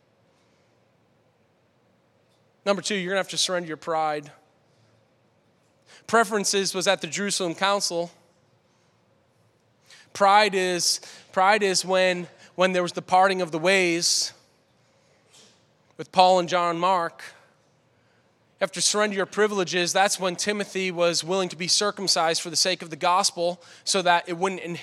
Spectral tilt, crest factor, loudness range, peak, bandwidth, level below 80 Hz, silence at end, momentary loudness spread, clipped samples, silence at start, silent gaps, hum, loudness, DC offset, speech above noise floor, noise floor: -2.5 dB/octave; 24 dB; 6 LU; -2 dBFS; 15.5 kHz; -82 dBFS; 0 s; 10 LU; under 0.1%; 2.65 s; none; none; -23 LUFS; under 0.1%; 41 dB; -64 dBFS